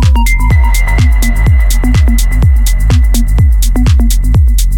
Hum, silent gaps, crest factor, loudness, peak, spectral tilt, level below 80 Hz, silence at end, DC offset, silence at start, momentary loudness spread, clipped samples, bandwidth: none; none; 6 dB; -10 LUFS; 0 dBFS; -5.5 dB/octave; -8 dBFS; 0 s; under 0.1%; 0 s; 1 LU; under 0.1%; 18 kHz